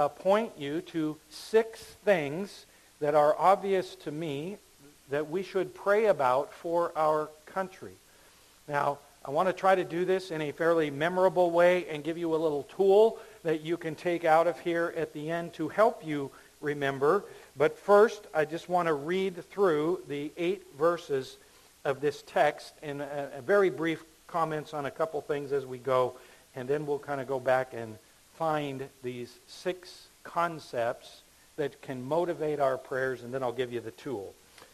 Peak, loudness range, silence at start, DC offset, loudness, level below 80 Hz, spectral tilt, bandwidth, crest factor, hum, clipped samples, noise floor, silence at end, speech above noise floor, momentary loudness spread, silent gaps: -10 dBFS; 6 LU; 0 s; under 0.1%; -29 LUFS; -68 dBFS; -6 dB/octave; 14 kHz; 20 dB; none; under 0.1%; -58 dBFS; 0.1 s; 29 dB; 14 LU; none